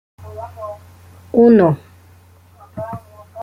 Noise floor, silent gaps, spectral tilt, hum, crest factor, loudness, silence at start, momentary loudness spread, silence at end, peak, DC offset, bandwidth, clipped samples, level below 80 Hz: -47 dBFS; none; -9.5 dB/octave; none; 16 dB; -13 LUFS; 0.2 s; 25 LU; 0 s; -2 dBFS; under 0.1%; 5.2 kHz; under 0.1%; -56 dBFS